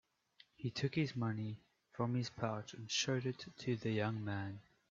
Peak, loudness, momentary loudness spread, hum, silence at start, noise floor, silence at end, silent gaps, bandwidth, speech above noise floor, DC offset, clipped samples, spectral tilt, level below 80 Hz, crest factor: -22 dBFS; -40 LUFS; 9 LU; none; 0.6 s; -70 dBFS; 0.3 s; none; 7.6 kHz; 30 dB; under 0.1%; under 0.1%; -5 dB/octave; -74 dBFS; 18 dB